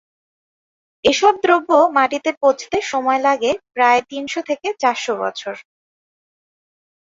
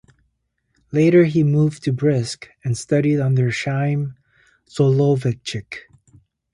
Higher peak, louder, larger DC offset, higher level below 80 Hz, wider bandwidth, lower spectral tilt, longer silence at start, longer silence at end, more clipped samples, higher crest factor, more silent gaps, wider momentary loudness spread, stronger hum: about the same, -2 dBFS vs -2 dBFS; about the same, -17 LUFS vs -19 LUFS; neither; second, -60 dBFS vs -54 dBFS; second, 7.8 kHz vs 11.5 kHz; second, -2.5 dB/octave vs -7 dB/octave; first, 1.05 s vs 0.9 s; first, 1.45 s vs 0.75 s; neither; about the same, 18 dB vs 16 dB; first, 2.37-2.41 s vs none; second, 11 LU vs 15 LU; neither